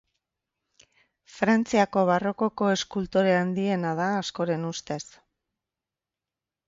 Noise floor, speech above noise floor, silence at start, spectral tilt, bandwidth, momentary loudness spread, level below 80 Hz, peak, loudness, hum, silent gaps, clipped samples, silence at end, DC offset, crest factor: -89 dBFS; 65 dB; 1.35 s; -5.5 dB/octave; 7.8 kHz; 10 LU; -62 dBFS; -10 dBFS; -25 LUFS; none; none; under 0.1%; 1.65 s; under 0.1%; 18 dB